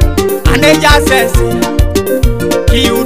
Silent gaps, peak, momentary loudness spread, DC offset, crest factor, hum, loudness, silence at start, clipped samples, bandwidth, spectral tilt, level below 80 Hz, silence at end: none; 0 dBFS; 6 LU; 4%; 10 dB; none; -10 LUFS; 0 s; 1%; 16.5 kHz; -5 dB/octave; -14 dBFS; 0 s